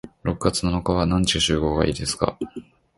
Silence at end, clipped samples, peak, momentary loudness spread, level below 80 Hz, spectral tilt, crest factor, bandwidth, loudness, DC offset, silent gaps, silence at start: 0.35 s; under 0.1%; -2 dBFS; 12 LU; -36 dBFS; -4.5 dB/octave; 20 dB; 11.5 kHz; -22 LUFS; under 0.1%; none; 0.05 s